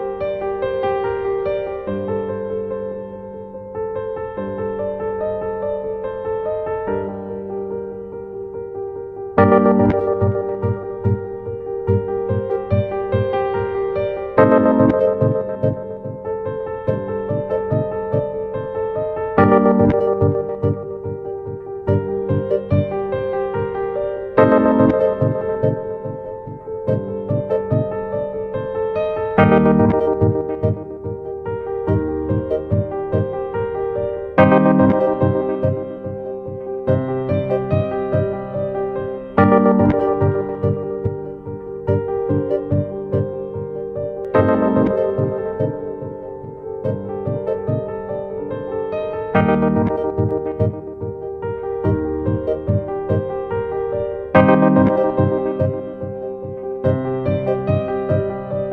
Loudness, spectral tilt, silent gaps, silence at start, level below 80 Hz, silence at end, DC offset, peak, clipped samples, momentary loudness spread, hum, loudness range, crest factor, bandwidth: -20 LUFS; -11 dB/octave; none; 0 s; -44 dBFS; 0 s; under 0.1%; 0 dBFS; under 0.1%; 14 LU; none; 7 LU; 18 dB; 4.7 kHz